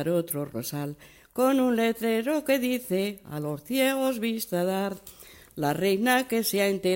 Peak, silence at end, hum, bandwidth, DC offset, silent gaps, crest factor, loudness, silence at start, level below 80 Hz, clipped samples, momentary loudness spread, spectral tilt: -8 dBFS; 0 s; none; 16.5 kHz; under 0.1%; none; 18 dB; -27 LUFS; 0 s; -64 dBFS; under 0.1%; 11 LU; -4.5 dB/octave